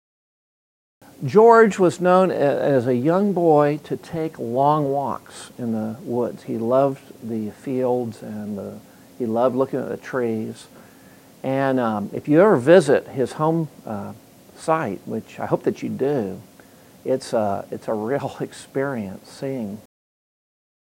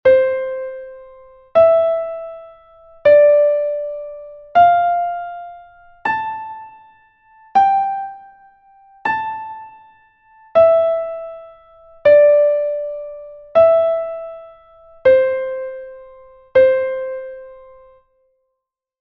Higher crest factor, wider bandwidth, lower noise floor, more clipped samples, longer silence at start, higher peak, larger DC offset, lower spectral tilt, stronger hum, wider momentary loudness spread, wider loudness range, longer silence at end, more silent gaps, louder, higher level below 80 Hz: about the same, 20 dB vs 16 dB; first, 16 kHz vs 5.8 kHz; second, -48 dBFS vs -78 dBFS; neither; first, 1.2 s vs 0.05 s; about the same, 0 dBFS vs -2 dBFS; neither; about the same, -7 dB/octave vs -6 dB/octave; neither; second, 17 LU vs 22 LU; first, 9 LU vs 6 LU; second, 1.05 s vs 1.45 s; neither; second, -21 LUFS vs -16 LUFS; second, -66 dBFS vs -56 dBFS